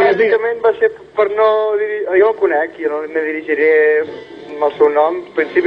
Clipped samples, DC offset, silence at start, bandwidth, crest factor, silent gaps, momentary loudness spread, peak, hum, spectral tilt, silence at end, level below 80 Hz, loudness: under 0.1%; under 0.1%; 0 s; 5.2 kHz; 14 dB; none; 7 LU; 0 dBFS; none; -6.5 dB/octave; 0 s; -60 dBFS; -15 LUFS